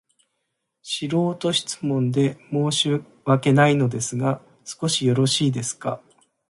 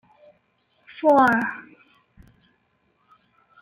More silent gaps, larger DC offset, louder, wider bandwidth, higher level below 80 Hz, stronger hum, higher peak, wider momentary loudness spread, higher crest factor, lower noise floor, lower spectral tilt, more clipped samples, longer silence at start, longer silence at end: neither; neither; second, -22 LUFS vs -19 LUFS; second, 11.5 kHz vs 14 kHz; about the same, -62 dBFS vs -64 dBFS; neither; about the same, -6 dBFS vs -6 dBFS; second, 11 LU vs 24 LU; about the same, 18 dB vs 20 dB; first, -77 dBFS vs -67 dBFS; second, -5 dB/octave vs -6.5 dB/octave; neither; second, 0.85 s vs 1.05 s; second, 0.55 s vs 2 s